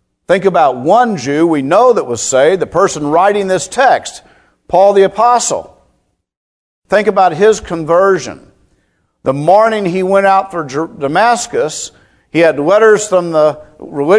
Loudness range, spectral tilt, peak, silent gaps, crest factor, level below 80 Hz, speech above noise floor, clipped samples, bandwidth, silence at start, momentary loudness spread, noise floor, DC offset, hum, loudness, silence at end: 3 LU; -4.5 dB/octave; 0 dBFS; 6.37-6.82 s; 12 dB; -50 dBFS; 50 dB; 0.3%; 11 kHz; 0.3 s; 10 LU; -60 dBFS; under 0.1%; none; -11 LUFS; 0 s